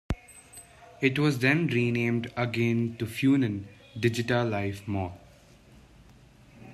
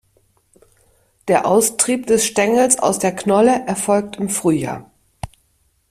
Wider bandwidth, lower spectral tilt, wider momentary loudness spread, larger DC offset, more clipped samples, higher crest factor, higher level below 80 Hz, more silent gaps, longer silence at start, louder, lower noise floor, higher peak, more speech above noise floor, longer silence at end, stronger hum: second, 13.5 kHz vs 16 kHz; first, -6.5 dB/octave vs -4 dB/octave; second, 14 LU vs 18 LU; neither; neither; about the same, 20 dB vs 18 dB; about the same, -52 dBFS vs -50 dBFS; neither; second, 0.1 s vs 1.25 s; second, -27 LUFS vs -16 LUFS; second, -55 dBFS vs -62 dBFS; second, -10 dBFS vs 0 dBFS; second, 28 dB vs 46 dB; second, 0 s vs 0.65 s; neither